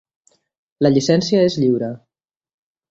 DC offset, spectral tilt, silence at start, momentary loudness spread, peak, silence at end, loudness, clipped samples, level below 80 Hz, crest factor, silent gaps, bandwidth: under 0.1%; -6 dB/octave; 0.8 s; 11 LU; -2 dBFS; 0.95 s; -17 LUFS; under 0.1%; -58 dBFS; 18 dB; none; 8 kHz